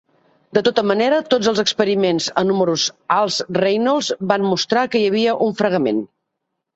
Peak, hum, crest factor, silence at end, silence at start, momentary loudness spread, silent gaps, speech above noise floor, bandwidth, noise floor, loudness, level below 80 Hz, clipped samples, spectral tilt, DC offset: 0 dBFS; none; 18 dB; 0.7 s; 0.55 s; 3 LU; none; 60 dB; 8.2 kHz; -77 dBFS; -18 LUFS; -62 dBFS; under 0.1%; -4 dB/octave; under 0.1%